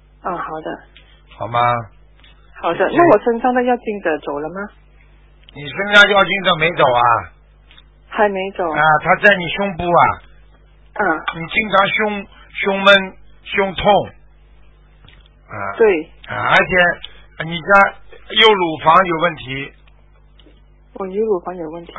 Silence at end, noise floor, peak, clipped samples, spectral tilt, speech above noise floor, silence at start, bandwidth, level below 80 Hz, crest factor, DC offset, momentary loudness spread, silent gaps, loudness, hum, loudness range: 0 s; -47 dBFS; 0 dBFS; under 0.1%; -5.5 dB/octave; 32 dB; 0.25 s; 8 kHz; -44 dBFS; 18 dB; under 0.1%; 17 LU; none; -15 LUFS; none; 4 LU